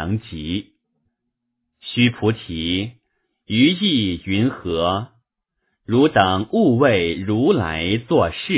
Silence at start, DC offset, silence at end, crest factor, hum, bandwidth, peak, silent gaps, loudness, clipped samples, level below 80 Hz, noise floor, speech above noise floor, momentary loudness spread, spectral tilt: 0 s; under 0.1%; 0 s; 18 dB; none; 4 kHz; -2 dBFS; none; -19 LUFS; under 0.1%; -42 dBFS; -77 dBFS; 58 dB; 11 LU; -10.5 dB/octave